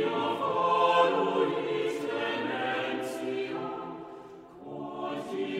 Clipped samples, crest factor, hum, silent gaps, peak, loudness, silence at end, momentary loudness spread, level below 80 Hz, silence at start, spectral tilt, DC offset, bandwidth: under 0.1%; 18 dB; none; none; -12 dBFS; -29 LUFS; 0 s; 19 LU; -74 dBFS; 0 s; -5 dB/octave; under 0.1%; 15.5 kHz